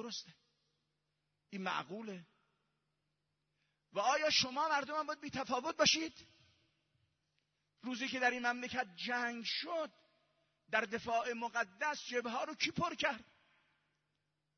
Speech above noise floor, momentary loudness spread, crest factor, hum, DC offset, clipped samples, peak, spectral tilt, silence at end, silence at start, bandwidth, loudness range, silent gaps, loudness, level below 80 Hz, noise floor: 47 dB; 15 LU; 24 dB; none; under 0.1%; under 0.1%; -18 dBFS; -0.5 dB/octave; 1.35 s; 0 s; 6.4 kHz; 8 LU; none; -37 LUFS; -76 dBFS; -85 dBFS